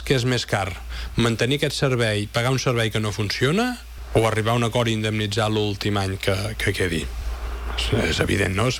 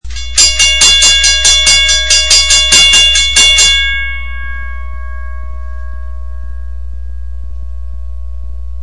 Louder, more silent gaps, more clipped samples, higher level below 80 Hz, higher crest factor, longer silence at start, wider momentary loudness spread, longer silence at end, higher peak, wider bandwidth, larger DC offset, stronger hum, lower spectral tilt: second, -22 LUFS vs -5 LUFS; neither; second, under 0.1% vs 1%; second, -36 dBFS vs -22 dBFS; about the same, 16 dB vs 12 dB; about the same, 0 s vs 0 s; second, 8 LU vs 22 LU; about the same, 0 s vs 0 s; second, -6 dBFS vs 0 dBFS; first, 18 kHz vs 12 kHz; second, under 0.1% vs 9%; neither; first, -5 dB/octave vs 1 dB/octave